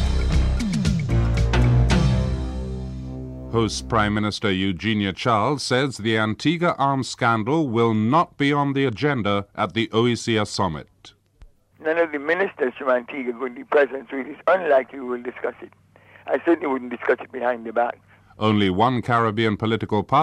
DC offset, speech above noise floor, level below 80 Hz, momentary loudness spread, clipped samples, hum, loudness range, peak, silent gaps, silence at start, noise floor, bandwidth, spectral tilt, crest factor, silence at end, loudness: under 0.1%; 29 dB; -32 dBFS; 10 LU; under 0.1%; none; 4 LU; -6 dBFS; none; 0 s; -51 dBFS; 11.5 kHz; -6 dB/octave; 16 dB; 0 s; -22 LUFS